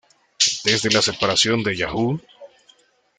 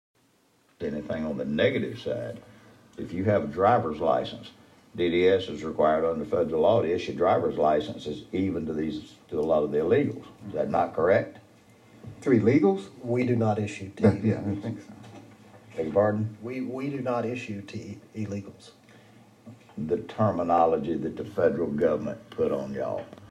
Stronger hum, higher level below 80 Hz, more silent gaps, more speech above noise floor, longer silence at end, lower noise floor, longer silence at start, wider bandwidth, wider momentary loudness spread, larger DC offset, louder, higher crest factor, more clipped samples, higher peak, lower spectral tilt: neither; first, -52 dBFS vs -58 dBFS; neither; about the same, 37 dB vs 39 dB; first, 0.75 s vs 0.05 s; second, -57 dBFS vs -65 dBFS; second, 0.4 s vs 0.8 s; about the same, 11 kHz vs 10.5 kHz; second, 7 LU vs 14 LU; neither; first, -19 LUFS vs -27 LUFS; about the same, 22 dB vs 18 dB; neither; first, 0 dBFS vs -8 dBFS; second, -2.5 dB/octave vs -7.5 dB/octave